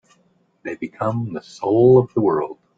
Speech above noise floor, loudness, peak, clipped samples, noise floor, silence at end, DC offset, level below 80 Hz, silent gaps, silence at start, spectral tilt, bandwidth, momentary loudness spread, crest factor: 43 dB; -18 LUFS; -2 dBFS; under 0.1%; -61 dBFS; 0.25 s; under 0.1%; -56 dBFS; none; 0.65 s; -9 dB/octave; 7.6 kHz; 17 LU; 16 dB